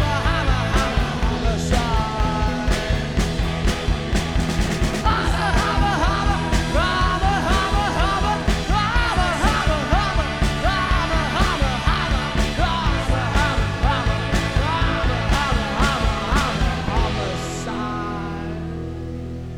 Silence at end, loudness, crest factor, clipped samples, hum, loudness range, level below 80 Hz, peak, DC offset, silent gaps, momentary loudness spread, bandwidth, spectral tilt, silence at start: 0 s; -21 LUFS; 16 dB; under 0.1%; none; 2 LU; -24 dBFS; -4 dBFS; under 0.1%; none; 6 LU; 14.5 kHz; -5 dB/octave; 0 s